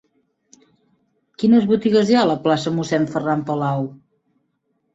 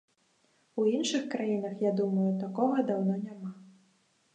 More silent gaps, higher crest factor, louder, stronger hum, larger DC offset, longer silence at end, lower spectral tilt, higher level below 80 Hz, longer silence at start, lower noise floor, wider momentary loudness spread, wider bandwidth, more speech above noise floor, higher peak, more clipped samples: neither; about the same, 16 dB vs 18 dB; first, -18 LUFS vs -30 LUFS; neither; neither; first, 1 s vs 0.65 s; about the same, -6.5 dB/octave vs -6 dB/octave; first, -60 dBFS vs -84 dBFS; first, 1.4 s vs 0.75 s; about the same, -70 dBFS vs -70 dBFS; second, 7 LU vs 12 LU; second, 8 kHz vs 9.2 kHz; first, 52 dB vs 41 dB; first, -4 dBFS vs -14 dBFS; neither